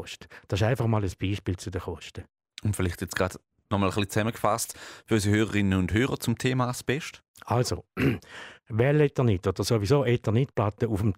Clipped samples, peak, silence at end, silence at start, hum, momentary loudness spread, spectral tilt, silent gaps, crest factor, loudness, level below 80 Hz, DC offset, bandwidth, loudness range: under 0.1%; -10 dBFS; 0 s; 0 s; none; 16 LU; -6 dB/octave; 7.28-7.34 s; 16 dB; -27 LUFS; -50 dBFS; under 0.1%; 16 kHz; 5 LU